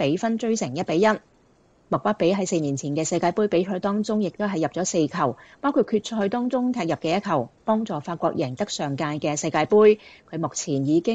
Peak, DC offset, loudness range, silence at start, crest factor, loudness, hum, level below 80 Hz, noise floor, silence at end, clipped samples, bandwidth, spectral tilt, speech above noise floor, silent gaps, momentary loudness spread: -6 dBFS; under 0.1%; 2 LU; 0 s; 18 dB; -24 LUFS; none; -64 dBFS; -59 dBFS; 0 s; under 0.1%; 9.2 kHz; -5 dB/octave; 36 dB; none; 6 LU